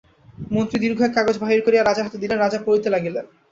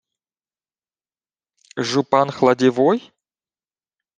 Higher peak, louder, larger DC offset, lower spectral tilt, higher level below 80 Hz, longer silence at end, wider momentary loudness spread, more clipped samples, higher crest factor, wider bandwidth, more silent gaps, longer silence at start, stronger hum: about the same, -2 dBFS vs 0 dBFS; about the same, -20 LUFS vs -18 LUFS; neither; about the same, -6 dB/octave vs -5.5 dB/octave; first, -54 dBFS vs -68 dBFS; second, 0.25 s vs 1.2 s; about the same, 9 LU vs 10 LU; neither; about the same, 18 dB vs 22 dB; second, 7.6 kHz vs 9.4 kHz; neither; second, 0.4 s vs 1.75 s; neither